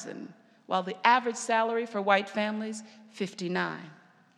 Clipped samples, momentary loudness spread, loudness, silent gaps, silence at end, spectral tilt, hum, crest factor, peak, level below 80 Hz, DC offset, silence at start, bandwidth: under 0.1%; 19 LU; -29 LUFS; none; 0.45 s; -4 dB/octave; none; 24 dB; -6 dBFS; under -90 dBFS; under 0.1%; 0 s; 12 kHz